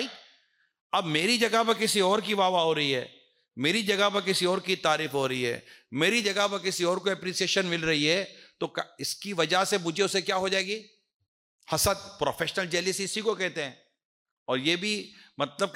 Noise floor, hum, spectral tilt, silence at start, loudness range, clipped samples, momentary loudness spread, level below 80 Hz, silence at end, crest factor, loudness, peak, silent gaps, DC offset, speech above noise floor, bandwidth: -66 dBFS; none; -3 dB/octave; 0 s; 4 LU; under 0.1%; 10 LU; -60 dBFS; 0 s; 16 dB; -27 LUFS; -12 dBFS; 0.81-0.90 s, 11.14-11.20 s, 11.28-11.59 s, 14.05-14.25 s, 14.31-14.46 s; under 0.1%; 39 dB; 16 kHz